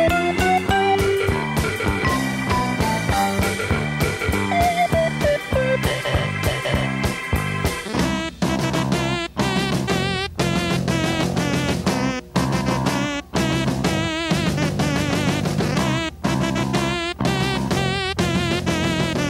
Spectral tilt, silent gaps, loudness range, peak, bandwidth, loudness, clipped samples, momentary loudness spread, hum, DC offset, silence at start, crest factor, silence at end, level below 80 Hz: -5 dB/octave; none; 2 LU; -8 dBFS; 16 kHz; -21 LUFS; under 0.1%; 4 LU; none; under 0.1%; 0 s; 12 dB; 0 s; -34 dBFS